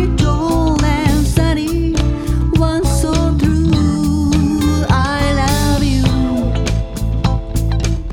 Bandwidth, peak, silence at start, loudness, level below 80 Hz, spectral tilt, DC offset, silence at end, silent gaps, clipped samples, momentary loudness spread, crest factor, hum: 17 kHz; 0 dBFS; 0 s; -15 LUFS; -18 dBFS; -6 dB/octave; under 0.1%; 0 s; none; under 0.1%; 4 LU; 14 dB; none